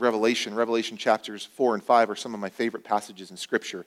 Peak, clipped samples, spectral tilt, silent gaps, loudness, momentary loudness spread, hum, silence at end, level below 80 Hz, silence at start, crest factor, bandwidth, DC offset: -6 dBFS; under 0.1%; -3.5 dB/octave; none; -26 LUFS; 11 LU; none; 0.05 s; -78 dBFS; 0 s; 20 dB; 15.5 kHz; under 0.1%